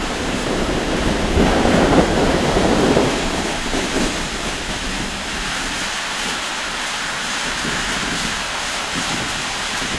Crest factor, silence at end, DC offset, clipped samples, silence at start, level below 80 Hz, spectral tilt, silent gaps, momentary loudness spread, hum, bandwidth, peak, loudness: 20 dB; 0 s; 0.1%; under 0.1%; 0 s; -30 dBFS; -3.5 dB/octave; none; 7 LU; none; 12 kHz; 0 dBFS; -19 LUFS